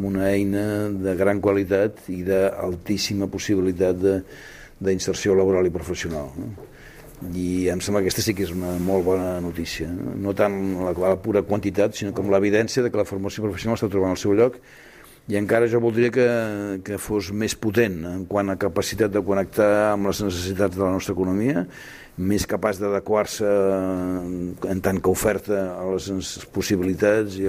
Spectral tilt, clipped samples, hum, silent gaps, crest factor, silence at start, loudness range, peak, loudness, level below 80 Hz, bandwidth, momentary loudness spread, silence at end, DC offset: -5.5 dB/octave; under 0.1%; none; none; 18 dB; 0 s; 2 LU; -4 dBFS; -23 LUFS; -48 dBFS; 16 kHz; 9 LU; 0 s; under 0.1%